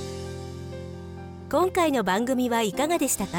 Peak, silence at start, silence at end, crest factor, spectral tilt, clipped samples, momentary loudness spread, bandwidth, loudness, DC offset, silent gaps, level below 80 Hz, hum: -12 dBFS; 0 s; 0 s; 14 dB; -4 dB/octave; under 0.1%; 16 LU; 19 kHz; -25 LUFS; under 0.1%; none; -52 dBFS; none